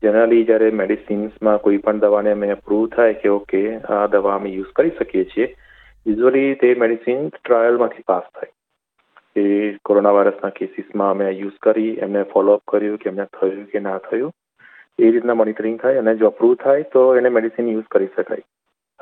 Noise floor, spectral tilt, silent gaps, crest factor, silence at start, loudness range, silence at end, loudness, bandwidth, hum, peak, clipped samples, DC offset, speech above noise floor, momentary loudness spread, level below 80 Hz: -68 dBFS; -10 dB/octave; none; 16 dB; 0 s; 3 LU; 0.6 s; -18 LUFS; 4 kHz; none; -2 dBFS; under 0.1%; under 0.1%; 52 dB; 10 LU; -56 dBFS